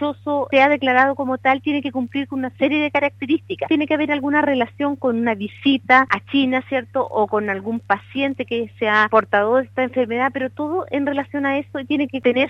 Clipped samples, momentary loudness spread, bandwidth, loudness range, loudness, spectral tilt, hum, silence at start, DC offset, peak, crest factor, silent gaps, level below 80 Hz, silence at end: under 0.1%; 9 LU; 6.6 kHz; 2 LU; -19 LUFS; -6.5 dB/octave; none; 0 s; under 0.1%; -2 dBFS; 18 dB; none; -62 dBFS; 0 s